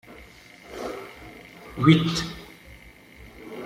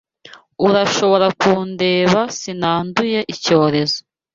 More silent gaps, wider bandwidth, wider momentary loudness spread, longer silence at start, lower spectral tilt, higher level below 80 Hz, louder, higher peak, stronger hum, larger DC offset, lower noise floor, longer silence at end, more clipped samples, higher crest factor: neither; first, 15 kHz vs 7.6 kHz; first, 28 LU vs 6 LU; second, 0.1 s vs 0.6 s; first, -6 dB/octave vs -4.5 dB/octave; about the same, -52 dBFS vs -54 dBFS; second, -23 LUFS vs -16 LUFS; about the same, -2 dBFS vs -2 dBFS; neither; neither; first, -48 dBFS vs -44 dBFS; second, 0 s vs 0.35 s; neither; first, 24 dB vs 16 dB